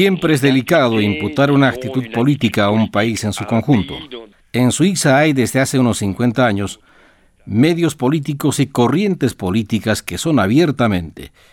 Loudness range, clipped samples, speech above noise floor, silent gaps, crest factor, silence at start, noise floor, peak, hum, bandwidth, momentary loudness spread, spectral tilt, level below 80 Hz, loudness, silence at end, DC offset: 2 LU; under 0.1%; 35 dB; none; 14 dB; 0 s; -50 dBFS; -2 dBFS; none; 17.5 kHz; 9 LU; -5.5 dB/octave; -50 dBFS; -16 LUFS; 0.25 s; under 0.1%